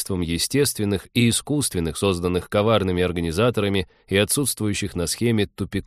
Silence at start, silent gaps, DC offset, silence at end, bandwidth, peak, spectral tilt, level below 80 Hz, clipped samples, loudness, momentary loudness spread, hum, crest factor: 0 s; none; under 0.1%; 0.05 s; 15.5 kHz; -4 dBFS; -4.5 dB/octave; -44 dBFS; under 0.1%; -22 LUFS; 5 LU; none; 18 dB